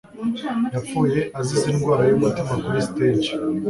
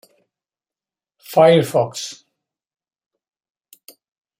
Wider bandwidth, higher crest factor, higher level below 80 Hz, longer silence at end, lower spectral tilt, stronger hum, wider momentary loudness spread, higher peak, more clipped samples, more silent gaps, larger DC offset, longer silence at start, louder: second, 11.5 kHz vs 16.5 kHz; second, 14 dB vs 20 dB; first, -50 dBFS vs -68 dBFS; second, 0 s vs 2.25 s; about the same, -6.5 dB/octave vs -5.5 dB/octave; neither; second, 7 LU vs 17 LU; second, -6 dBFS vs -2 dBFS; neither; neither; neither; second, 0.15 s vs 1.3 s; second, -21 LUFS vs -16 LUFS